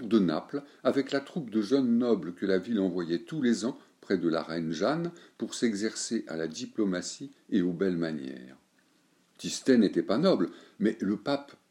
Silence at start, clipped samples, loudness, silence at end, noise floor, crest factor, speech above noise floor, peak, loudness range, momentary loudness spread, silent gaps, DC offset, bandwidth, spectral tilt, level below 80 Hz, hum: 0 s; under 0.1%; -30 LUFS; 0.2 s; -67 dBFS; 20 dB; 38 dB; -10 dBFS; 4 LU; 11 LU; none; under 0.1%; 11.5 kHz; -5.5 dB/octave; -76 dBFS; none